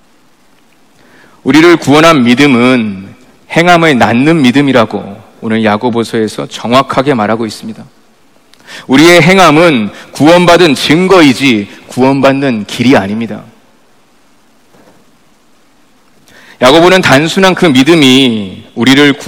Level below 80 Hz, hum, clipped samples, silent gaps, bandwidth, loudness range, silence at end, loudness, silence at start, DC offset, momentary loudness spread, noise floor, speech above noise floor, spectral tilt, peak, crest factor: -42 dBFS; none; 7%; none; over 20 kHz; 7 LU; 0 s; -7 LUFS; 1.45 s; under 0.1%; 15 LU; -48 dBFS; 41 dB; -5 dB/octave; 0 dBFS; 8 dB